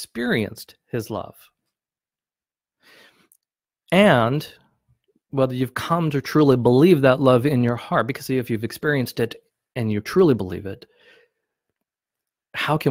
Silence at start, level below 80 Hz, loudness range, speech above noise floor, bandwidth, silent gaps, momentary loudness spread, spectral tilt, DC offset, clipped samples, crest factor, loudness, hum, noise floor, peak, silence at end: 0 s; -56 dBFS; 11 LU; over 70 dB; 16.5 kHz; none; 17 LU; -7 dB/octave; under 0.1%; under 0.1%; 20 dB; -20 LUFS; none; under -90 dBFS; -2 dBFS; 0 s